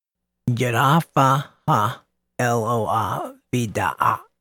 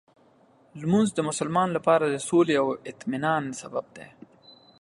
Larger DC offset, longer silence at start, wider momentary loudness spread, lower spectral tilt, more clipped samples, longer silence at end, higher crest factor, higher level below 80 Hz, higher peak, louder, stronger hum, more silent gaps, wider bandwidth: neither; second, 0.45 s vs 0.75 s; second, 9 LU vs 12 LU; about the same, -6 dB/octave vs -5.5 dB/octave; neither; second, 0.2 s vs 0.75 s; about the same, 18 dB vs 18 dB; first, -58 dBFS vs -66 dBFS; first, -2 dBFS vs -8 dBFS; first, -21 LUFS vs -25 LUFS; neither; neither; first, 18 kHz vs 11.5 kHz